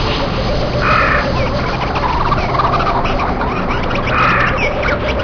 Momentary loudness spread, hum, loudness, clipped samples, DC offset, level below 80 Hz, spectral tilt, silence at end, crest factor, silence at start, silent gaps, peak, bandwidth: 5 LU; none; -15 LUFS; under 0.1%; under 0.1%; -22 dBFS; -6 dB/octave; 0 s; 12 dB; 0 s; none; -2 dBFS; 5.4 kHz